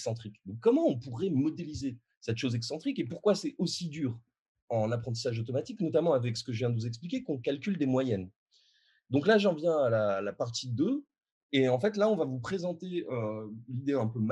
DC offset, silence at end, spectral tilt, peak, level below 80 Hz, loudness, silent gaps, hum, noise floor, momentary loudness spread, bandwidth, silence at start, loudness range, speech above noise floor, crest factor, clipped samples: under 0.1%; 0 s; -6.5 dB/octave; -14 dBFS; -70 dBFS; -31 LUFS; 2.17-2.21 s, 4.40-4.55 s, 4.62-4.68 s, 8.36-8.46 s, 11.31-11.49 s; none; -69 dBFS; 10 LU; 11.5 kHz; 0 s; 4 LU; 38 dB; 18 dB; under 0.1%